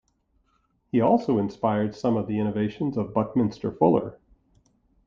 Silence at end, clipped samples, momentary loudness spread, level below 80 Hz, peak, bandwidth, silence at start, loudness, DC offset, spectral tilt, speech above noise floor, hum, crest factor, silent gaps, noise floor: 0.9 s; under 0.1%; 6 LU; -58 dBFS; -4 dBFS; 7.2 kHz; 0.95 s; -25 LUFS; under 0.1%; -9 dB/octave; 45 dB; none; 20 dB; none; -69 dBFS